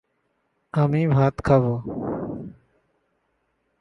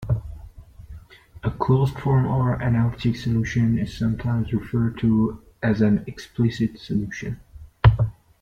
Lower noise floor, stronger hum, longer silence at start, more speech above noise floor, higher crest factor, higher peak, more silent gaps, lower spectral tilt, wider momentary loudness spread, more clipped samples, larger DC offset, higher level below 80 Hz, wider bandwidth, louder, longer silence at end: first, -72 dBFS vs -44 dBFS; neither; first, 0.75 s vs 0 s; first, 51 dB vs 22 dB; about the same, 20 dB vs 20 dB; second, -6 dBFS vs -2 dBFS; neither; about the same, -9.5 dB/octave vs -8.5 dB/octave; first, 14 LU vs 11 LU; neither; neither; second, -48 dBFS vs -38 dBFS; about the same, 7.2 kHz vs 7.6 kHz; about the same, -22 LUFS vs -23 LUFS; first, 1.3 s vs 0.3 s